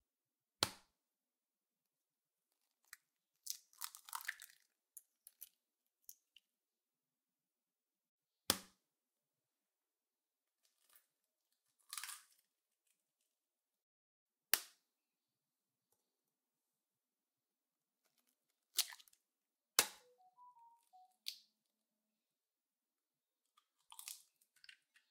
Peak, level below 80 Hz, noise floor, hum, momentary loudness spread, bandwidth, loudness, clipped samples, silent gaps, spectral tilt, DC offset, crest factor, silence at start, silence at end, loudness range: -6 dBFS; -88 dBFS; under -90 dBFS; none; 24 LU; 16 kHz; -42 LUFS; under 0.1%; 8.09-8.19 s, 13.82-14.26 s; 0.5 dB/octave; under 0.1%; 46 dB; 0.6 s; 0.4 s; 17 LU